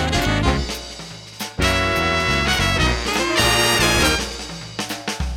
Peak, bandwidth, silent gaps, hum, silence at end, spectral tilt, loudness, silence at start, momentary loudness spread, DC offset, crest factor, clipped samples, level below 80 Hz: -2 dBFS; 18 kHz; none; none; 0 s; -3.5 dB/octave; -18 LUFS; 0 s; 15 LU; under 0.1%; 18 dB; under 0.1%; -28 dBFS